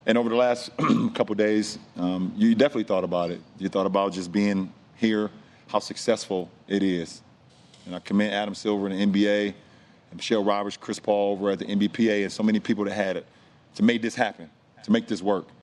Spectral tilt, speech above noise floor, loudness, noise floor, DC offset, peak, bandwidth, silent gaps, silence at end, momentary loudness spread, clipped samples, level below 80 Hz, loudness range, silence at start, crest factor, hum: -5.5 dB/octave; 29 dB; -25 LUFS; -54 dBFS; under 0.1%; -6 dBFS; 11 kHz; none; 0.15 s; 9 LU; under 0.1%; -68 dBFS; 3 LU; 0.05 s; 20 dB; none